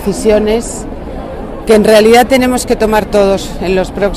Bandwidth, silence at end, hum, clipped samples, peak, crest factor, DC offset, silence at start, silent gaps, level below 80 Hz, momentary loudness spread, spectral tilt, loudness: 16 kHz; 0 s; none; 0.4%; 0 dBFS; 10 dB; 0.3%; 0 s; none; -26 dBFS; 18 LU; -4.5 dB/octave; -10 LUFS